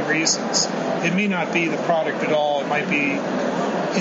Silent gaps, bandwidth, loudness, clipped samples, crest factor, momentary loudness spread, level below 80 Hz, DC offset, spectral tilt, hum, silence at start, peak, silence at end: none; 8 kHz; -21 LUFS; under 0.1%; 16 dB; 4 LU; -64 dBFS; under 0.1%; -3.5 dB/octave; none; 0 s; -6 dBFS; 0 s